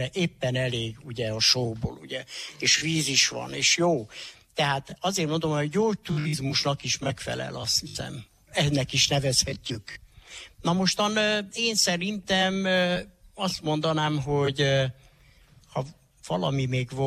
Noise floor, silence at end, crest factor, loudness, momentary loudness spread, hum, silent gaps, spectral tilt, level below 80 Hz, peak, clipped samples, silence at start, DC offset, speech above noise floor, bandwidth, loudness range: -56 dBFS; 0 s; 20 dB; -25 LUFS; 14 LU; none; none; -3.5 dB/octave; -54 dBFS; -8 dBFS; under 0.1%; 0 s; under 0.1%; 30 dB; 14.5 kHz; 4 LU